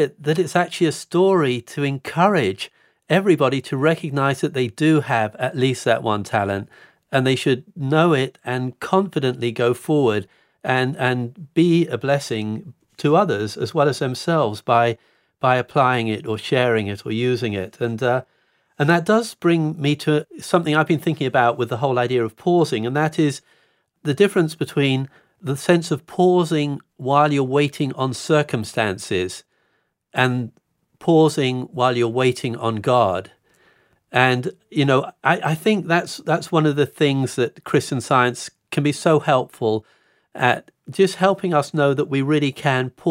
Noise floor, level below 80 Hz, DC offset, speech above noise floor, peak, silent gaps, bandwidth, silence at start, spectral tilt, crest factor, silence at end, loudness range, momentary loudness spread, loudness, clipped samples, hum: -68 dBFS; -68 dBFS; under 0.1%; 49 dB; -2 dBFS; none; 16 kHz; 0 s; -6 dB/octave; 18 dB; 0 s; 2 LU; 8 LU; -20 LUFS; under 0.1%; none